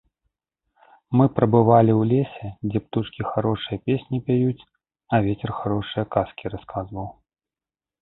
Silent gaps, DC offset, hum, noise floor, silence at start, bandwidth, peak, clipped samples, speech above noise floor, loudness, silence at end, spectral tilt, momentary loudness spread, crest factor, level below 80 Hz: none; under 0.1%; none; under -90 dBFS; 1.1 s; 4.1 kHz; -2 dBFS; under 0.1%; over 69 dB; -22 LUFS; 0.9 s; -12.5 dB/octave; 15 LU; 20 dB; -50 dBFS